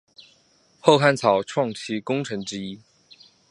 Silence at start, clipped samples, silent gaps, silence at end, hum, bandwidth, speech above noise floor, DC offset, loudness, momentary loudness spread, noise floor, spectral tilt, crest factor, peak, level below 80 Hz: 0.2 s; under 0.1%; none; 0.75 s; none; 11.5 kHz; 39 dB; under 0.1%; -22 LUFS; 16 LU; -60 dBFS; -5 dB/octave; 22 dB; -2 dBFS; -66 dBFS